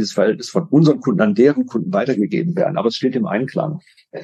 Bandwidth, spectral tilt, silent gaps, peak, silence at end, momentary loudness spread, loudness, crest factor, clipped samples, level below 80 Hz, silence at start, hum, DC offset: 9 kHz; -7 dB/octave; none; -2 dBFS; 0 s; 9 LU; -17 LUFS; 16 dB; under 0.1%; -66 dBFS; 0 s; none; under 0.1%